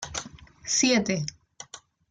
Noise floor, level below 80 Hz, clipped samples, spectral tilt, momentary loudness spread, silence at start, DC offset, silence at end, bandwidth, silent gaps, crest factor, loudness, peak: -47 dBFS; -58 dBFS; under 0.1%; -3 dB/octave; 24 LU; 0 s; under 0.1%; 0.3 s; 11 kHz; none; 20 dB; -25 LUFS; -10 dBFS